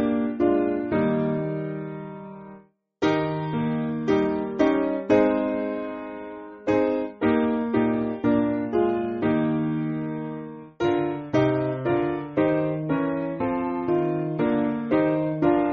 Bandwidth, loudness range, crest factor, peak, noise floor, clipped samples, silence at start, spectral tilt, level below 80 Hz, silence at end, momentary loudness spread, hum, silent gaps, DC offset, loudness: 6.6 kHz; 3 LU; 16 dB; -8 dBFS; -50 dBFS; under 0.1%; 0 s; -7 dB/octave; -54 dBFS; 0 s; 10 LU; none; none; under 0.1%; -24 LUFS